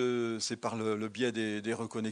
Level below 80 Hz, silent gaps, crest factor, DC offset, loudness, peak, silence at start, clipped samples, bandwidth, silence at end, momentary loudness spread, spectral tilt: -80 dBFS; none; 16 dB; under 0.1%; -34 LUFS; -18 dBFS; 0 s; under 0.1%; 11.5 kHz; 0 s; 3 LU; -4.5 dB/octave